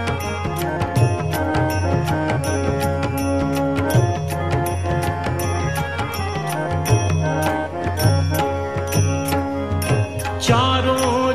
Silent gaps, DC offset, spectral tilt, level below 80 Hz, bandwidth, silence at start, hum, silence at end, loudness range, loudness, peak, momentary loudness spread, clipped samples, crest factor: none; 0.6%; -5.5 dB/octave; -32 dBFS; 14 kHz; 0 s; none; 0 s; 2 LU; -20 LUFS; -2 dBFS; 5 LU; under 0.1%; 16 dB